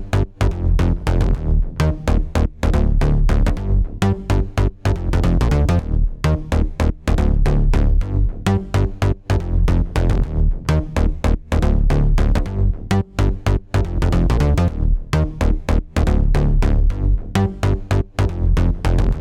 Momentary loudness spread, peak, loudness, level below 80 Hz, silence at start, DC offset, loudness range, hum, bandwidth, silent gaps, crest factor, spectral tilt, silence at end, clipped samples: 4 LU; -2 dBFS; -19 LUFS; -18 dBFS; 0 s; under 0.1%; 1 LU; none; 11 kHz; none; 14 dB; -7.5 dB/octave; 0 s; under 0.1%